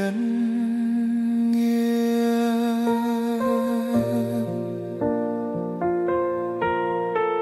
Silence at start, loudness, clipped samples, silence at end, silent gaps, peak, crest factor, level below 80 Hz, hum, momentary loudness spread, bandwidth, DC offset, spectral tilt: 0 s; -24 LUFS; under 0.1%; 0 s; none; -10 dBFS; 12 dB; -60 dBFS; none; 5 LU; 15 kHz; under 0.1%; -7 dB/octave